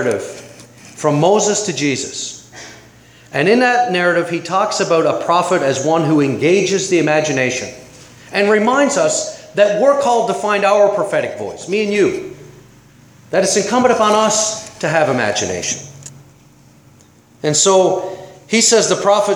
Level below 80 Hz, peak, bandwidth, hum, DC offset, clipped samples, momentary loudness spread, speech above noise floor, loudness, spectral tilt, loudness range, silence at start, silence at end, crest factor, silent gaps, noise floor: -58 dBFS; 0 dBFS; 18 kHz; none; under 0.1%; under 0.1%; 12 LU; 33 dB; -15 LUFS; -3.5 dB/octave; 3 LU; 0 s; 0 s; 16 dB; none; -47 dBFS